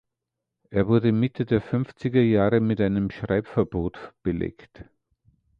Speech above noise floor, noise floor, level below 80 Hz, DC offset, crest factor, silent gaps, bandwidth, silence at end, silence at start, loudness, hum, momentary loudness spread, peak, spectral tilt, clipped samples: 61 dB; -84 dBFS; -46 dBFS; under 0.1%; 18 dB; none; 5.4 kHz; 0.75 s; 0.7 s; -24 LUFS; none; 10 LU; -6 dBFS; -10 dB/octave; under 0.1%